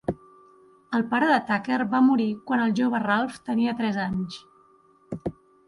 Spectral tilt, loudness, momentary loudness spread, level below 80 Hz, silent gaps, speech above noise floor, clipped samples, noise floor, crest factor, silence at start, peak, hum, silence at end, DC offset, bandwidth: -6.5 dB/octave; -24 LUFS; 14 LU; -58 dBFS; none; 35 dB; under 0.1%; -58 dBFS; 16 dB; 0.1 s; -10 dBFS; none; 0.35 s; under 0.1%; 11.5 kHz